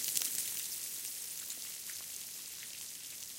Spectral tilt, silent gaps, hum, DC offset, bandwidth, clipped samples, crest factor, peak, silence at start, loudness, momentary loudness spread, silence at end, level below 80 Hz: 1.5 dB/octave; none; none; under 0.1%; 17 kHz; under 0.1%; 34 dB; -6 dBFS; 0 s; -39 LUFS; 10 LU; 0 s; -80 dBFS